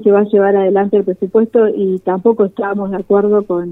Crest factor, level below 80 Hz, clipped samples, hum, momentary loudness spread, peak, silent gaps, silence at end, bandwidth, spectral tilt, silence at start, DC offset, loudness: 12 dB; -56 dBFS; under 0.1%; none; 5 LU; 0 dBFS; none; 0 s; 3.9 kHz; -10.5 dB/octave; 0 s; under 0.1%; -14 LUFS